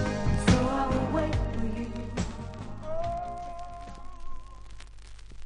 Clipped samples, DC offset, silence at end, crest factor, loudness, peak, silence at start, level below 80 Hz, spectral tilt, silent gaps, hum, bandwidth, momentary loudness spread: under 0.1%; under 0.1%; 0 s; 22 dB; -30 LUFS; -8 dBFS; 0 s; -38 dBFS; -6.5 dB/octave; none; none; 10.5 kHz; 25 LU